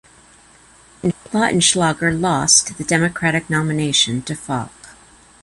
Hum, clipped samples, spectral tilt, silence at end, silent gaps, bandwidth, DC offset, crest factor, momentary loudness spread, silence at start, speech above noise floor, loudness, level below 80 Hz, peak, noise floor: none; under 0.1%; -3 dB/octave; 0.5 s; none; 11.5 kHz; under 0.1%; 20 dB; 12 LU; 1.05 s; 30 dB; -17 LUFS; -48 dBFS; 0 dBFS; -48 dBFS